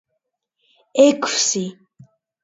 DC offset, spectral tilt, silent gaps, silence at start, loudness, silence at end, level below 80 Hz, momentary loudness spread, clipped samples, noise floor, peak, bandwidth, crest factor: under 0.1%; -2.5 dB/octave; none; 0.95 s; -17 LUFS; 0.7 s; -72 dBFS; 11 LU; under 0.1%; -76 dBFS; -2 dBFS; 8 kHz; 20 dB